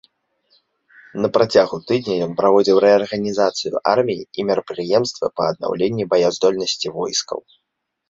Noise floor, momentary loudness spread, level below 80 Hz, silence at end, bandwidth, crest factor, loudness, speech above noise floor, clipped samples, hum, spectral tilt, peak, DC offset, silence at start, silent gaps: -77 dBFS; 9 LU; -60 dBFS; 0.7 s; 8 kHz; 18 dB; -18 LUFS; 59 dB; under 0.1%; none; -4.5 dB/octave; -2 dBFS; under 0.1%; 1.15 s; none